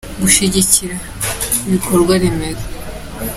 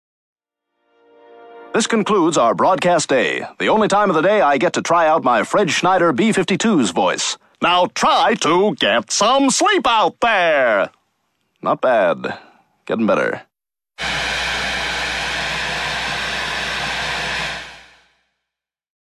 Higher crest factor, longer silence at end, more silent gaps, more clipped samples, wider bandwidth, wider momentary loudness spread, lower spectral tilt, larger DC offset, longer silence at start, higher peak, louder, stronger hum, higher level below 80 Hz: about the same, 16 dB vs 14 dB; second, 0 s vs 1.4 s; neither; neither; first, 16.5 kHz vs 13.5 kHz; first, 16 LU vs 8 LU; about the same, -3.5 dB/octave vs -3.5 dB/octave; neither; second, 0.05 s vs 1.4 s; first, 0 dBFS vs -4 dBFS; first, -14 LUFS vs -17 LUFS; neither; first, -32 dBFS vs -48 dBFS